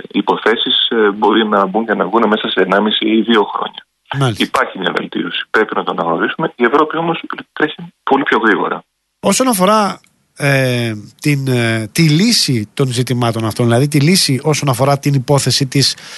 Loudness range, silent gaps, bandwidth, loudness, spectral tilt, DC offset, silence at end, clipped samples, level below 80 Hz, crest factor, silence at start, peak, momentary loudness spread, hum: 3 LU; none; 12.5 kHz; -14 LUFS; -4.5 dB/octave; under 0.1%; 0 s; under 0.1%; -56 dBFS; 14 dB; 0.15 s; 0 dBFS; 8 LU; none